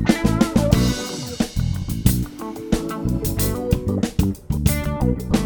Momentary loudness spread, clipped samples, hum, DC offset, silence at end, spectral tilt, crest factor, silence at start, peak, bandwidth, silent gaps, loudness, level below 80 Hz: 7 LU; under 0.1%; none; under 0.1%; 0 s; -6 dB/octave; 20 dB; 0 s; 0 dBFS; over 20 kHz; none; -21 LUFS; -28 dBFS